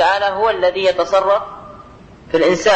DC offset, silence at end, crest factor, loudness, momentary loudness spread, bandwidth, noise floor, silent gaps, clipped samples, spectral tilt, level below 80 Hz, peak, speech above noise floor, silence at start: under 0.1%; 0 s; 14 dB; -16 LUFS; 8 LU; 8.6 kHz; -40 dBFS; none; under 0.1%; -3.5 dB/octave; -48 dBFS; -2 dBFS; 25 dB; 0 s